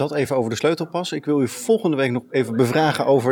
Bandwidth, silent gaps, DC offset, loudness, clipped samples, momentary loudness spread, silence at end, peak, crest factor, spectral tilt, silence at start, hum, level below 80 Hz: 18 kHz; none; under 0.1%; -21 LUFS; under 0.1%; 5 LU; 0 s; -4 dBFS; 16 dB; -5.5 dB/octave; 0 s; none; -66 dBFS